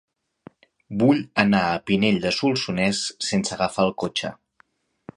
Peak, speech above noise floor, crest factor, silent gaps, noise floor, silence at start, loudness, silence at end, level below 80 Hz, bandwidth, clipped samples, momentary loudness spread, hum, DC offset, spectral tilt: 0 dBFS; 40 dB; 22 dB; none; -62 dBFS; 0.9 s; -22 LUFS; 0.85 s; -56 dBFS; 11 kHz; under 0.1%; 7 LU; none; under 0.1%; -4.5 dB/octave